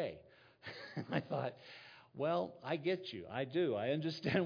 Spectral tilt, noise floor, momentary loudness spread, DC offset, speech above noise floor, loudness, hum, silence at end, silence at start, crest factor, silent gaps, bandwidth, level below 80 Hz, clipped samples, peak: -5 dB/octave; -62 dBFS; 17 LU; under 0.1%; 23 dB; -39 LUFS; none; 0 s; 0 s; 20 dB; none; 5.2 kHz; -78 dBFS; under 0.1%; -20 dBFS